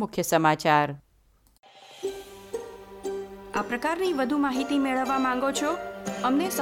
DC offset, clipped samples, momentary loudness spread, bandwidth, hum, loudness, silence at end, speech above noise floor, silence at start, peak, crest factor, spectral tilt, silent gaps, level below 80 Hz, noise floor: under 0.1%; under 0.1%; 15 LU; 17 kHz; none; -26 LUFS; 0 s; 37 dB; 0 s; -6 dBFS; 20 dB; -4.5 dB/octave; 1.59-1.63 s; -60 dBFS; -62 dBFS